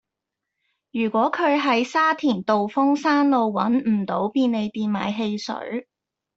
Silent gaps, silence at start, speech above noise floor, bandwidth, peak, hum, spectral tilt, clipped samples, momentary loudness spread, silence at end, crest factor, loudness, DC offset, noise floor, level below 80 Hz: none; 0.95 s; 63 dB; 7.8 kHz; -6 dBFS; none; -6 dB/octave; under 0.1%; 10 LU; 0.55 s; 16 dB; -22 LUFS; under 0.1%; -84 dBFS; -68 dBFS